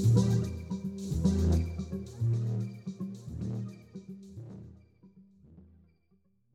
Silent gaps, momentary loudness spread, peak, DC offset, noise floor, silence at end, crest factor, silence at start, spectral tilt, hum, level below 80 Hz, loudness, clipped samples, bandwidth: none; 20 LU; -12 dBFS; under 0.1%; -71 dBFS; 0.95 s; 20 dB; 0 s; -8 dB/octave; none; -44 dBFS; -32 LUFS; under 0.1%; 11.5 kHz